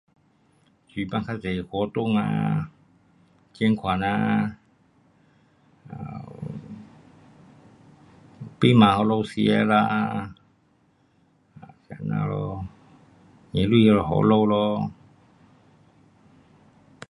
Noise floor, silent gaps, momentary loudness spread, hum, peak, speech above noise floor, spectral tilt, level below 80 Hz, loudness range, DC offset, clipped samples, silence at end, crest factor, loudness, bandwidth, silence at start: -63 dBFS; none; 21 LU; none; -2 dBFS; 41 dB; -8 dB/octave; -52 dBFS; 12 LU; under 0.1%; under 0.1%; 2.15 s; 24 dB; -23 LUFS; 11 kHz; 0.95 s